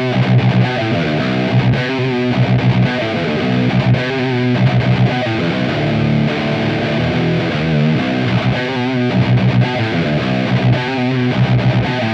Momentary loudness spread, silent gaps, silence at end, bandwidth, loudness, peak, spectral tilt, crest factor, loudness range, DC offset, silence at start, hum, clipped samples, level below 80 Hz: 3 LU; none; 0 s; 7.2 kHz; -15 LUFS; -2 dBFS; -7.5 dB/octave; 12 dB; 1 LU; under 0.1%; 0 s; none; under 0.1%; -40 dBFS